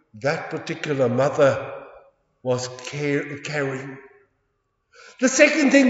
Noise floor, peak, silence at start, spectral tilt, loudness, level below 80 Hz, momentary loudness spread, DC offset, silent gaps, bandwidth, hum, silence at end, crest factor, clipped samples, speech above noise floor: -72 dBFS; -2 dBFS; 0.15 s; -4.5 dB/octave; -22 LUFS; -66 dBFS; 17 LU; under 0.1%; none; 8 kHz; none; 0 s; 22 dB; under 0.1%; 51 dB